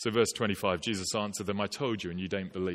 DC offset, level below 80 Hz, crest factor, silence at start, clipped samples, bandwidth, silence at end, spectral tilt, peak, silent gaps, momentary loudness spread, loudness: under 0.1%; -62 dBFS; 20 dB; 0 s; under 0.1%; 16.5 kHz; 0 s; -4 dB/octave; -12 dBFS; none; 6 LU; -32 LUFS